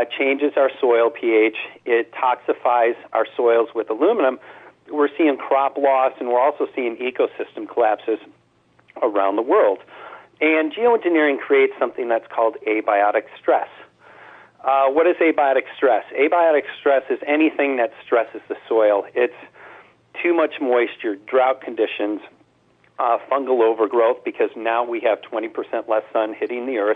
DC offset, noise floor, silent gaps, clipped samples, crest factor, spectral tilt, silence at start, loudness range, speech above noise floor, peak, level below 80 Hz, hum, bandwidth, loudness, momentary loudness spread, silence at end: under 0.1%; -58 dBFS; none; under 0.1%; 12 dB; -6.5 dB/octave; 0 s; 3 LU; 39 dB; -6 dBFS; -74 dBFS; none; 4 kHz; -20 LUFS; 8 LU; 0 s